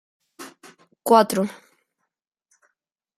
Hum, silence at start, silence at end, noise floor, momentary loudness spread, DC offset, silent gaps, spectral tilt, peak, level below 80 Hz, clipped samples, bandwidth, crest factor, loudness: none; 0.4 s; 1.65 s; -80 dBFS; 25 LU; under 0.1%; none; -4.5 dB/octave; -2 dBFS; -72 dBFS; under 0.1%; 15.5 kHz; 24 dB; -20 LUFS